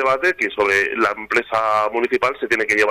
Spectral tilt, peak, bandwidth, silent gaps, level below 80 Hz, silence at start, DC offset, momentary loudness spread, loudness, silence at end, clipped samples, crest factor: -3.5 dB/octave; -4 dBFS; 14 kHz; none; -54 dBFS; 0 s; under 0.1%; 3 LU; -18 LUFS; 0 s; under 0.1%; 14 dB